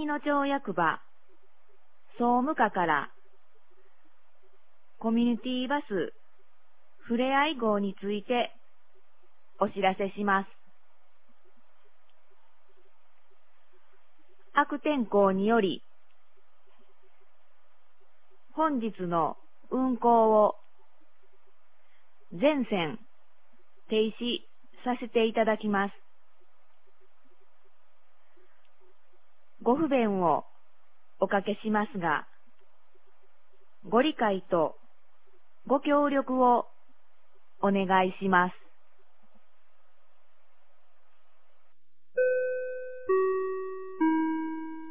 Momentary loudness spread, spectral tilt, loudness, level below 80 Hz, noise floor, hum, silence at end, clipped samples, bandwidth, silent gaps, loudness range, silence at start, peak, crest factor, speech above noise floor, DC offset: 11 LU; -4 dB/octave; -28 LUFS; -68 dBFS; -77 dBFS; 50 Hz at -65 dBFS; 0 s; under 0.1%; 4 kHz; none; 7 LU; 0 s; -8 dBFS; 22 dB; 50 dB; 0.8%